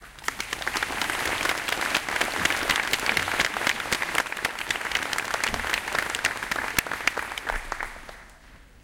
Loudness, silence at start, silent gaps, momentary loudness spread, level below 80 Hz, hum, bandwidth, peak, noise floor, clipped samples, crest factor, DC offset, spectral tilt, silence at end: -26 LUFS; 0 s; none; 8 LU; -46 dBFS; none; 17 kHz; -2 dBFS; -50 dBFS; under 0.1%; 26 dB; under 0.1%; -1 dB/octave; 0.05 s